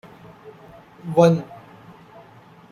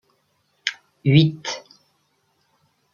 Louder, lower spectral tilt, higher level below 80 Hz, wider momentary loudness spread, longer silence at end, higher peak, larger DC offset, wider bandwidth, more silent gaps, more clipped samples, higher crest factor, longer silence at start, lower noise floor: about the same, -19 LUFS vs -21 LUFS; first, -7.5 dB/octave vs -6 dB/octave; about the same, -62 dBFS vs -60 dBFS; first, 28 LU vs 14 LU; second, 1.15 s vs 1.35 s; about the same, -2 dBFS vs -2 dBFS; neither; first, 10 kHz vs 7.2 kHz; neither; neither; about the same, 22 dB vs 22 dB; second, 0.45 s vs 0.65 s; second, -48 dBFS vs -67 dBFS